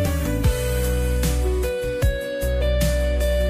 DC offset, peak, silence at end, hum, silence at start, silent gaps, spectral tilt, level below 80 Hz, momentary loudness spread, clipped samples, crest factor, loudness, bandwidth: under 0.1%; -8 dBFS; 0 s; none; 0 s; none; -5.5 dB/octave; -22 dBFS; 3 LU; under 0.1%; 12 dB; -23 LUFS; 15.5 kHz